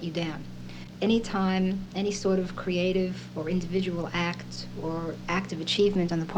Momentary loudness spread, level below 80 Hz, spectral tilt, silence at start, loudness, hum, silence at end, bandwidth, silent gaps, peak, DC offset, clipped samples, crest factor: 10 LU; -48 dBFS; -6 dB/octave; 0 s; -29 LUFS; none; 0 s; 9.4 kHz; none; -14 dBFS; under 0.1%; under 0.1%; 14 dB